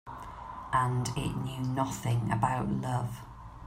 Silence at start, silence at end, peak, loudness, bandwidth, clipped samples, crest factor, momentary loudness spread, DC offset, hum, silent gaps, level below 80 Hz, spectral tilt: 0.05 s; 0 s; -12 dBFS; -32 LUFS; 16 kHz; under 0.1%; 20 dB; 14 LU; under 0.1%; none; none; -50 dBFS; -6 dB/octave